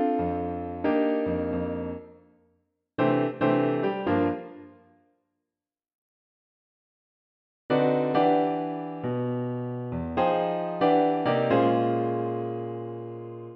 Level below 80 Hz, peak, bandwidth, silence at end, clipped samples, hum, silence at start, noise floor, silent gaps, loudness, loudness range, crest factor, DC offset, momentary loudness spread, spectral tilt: -56 dBFS; -10 dBFS; 5.4 kHz; 0 s; under 0.1%; none; 0 s; under -90 dBFS; 5.95-7.69 s; -26 LUFS; 7 LU; 18 dB; under 0.1%; 13 LU; -10 dB/octave